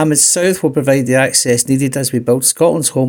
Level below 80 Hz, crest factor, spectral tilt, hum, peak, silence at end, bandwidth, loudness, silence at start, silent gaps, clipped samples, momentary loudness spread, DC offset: -52 dBFS; 12 dB; -4 dB/octave; none; 0 dBFS; 0 s; 18 kHz; -12 LUFS; 0 s; none; under 0.1%; 5 LU; under 0.1%